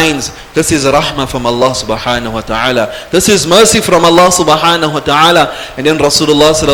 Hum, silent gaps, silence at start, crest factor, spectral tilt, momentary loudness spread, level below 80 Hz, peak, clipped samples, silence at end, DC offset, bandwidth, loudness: none; none; 0 s; 10 dB; -3 dB/octave; 9 LU; -32 dBFS; 0 dBFS; 1%; 0 s; under 0.1%; over 20 kHz; -9 LUFS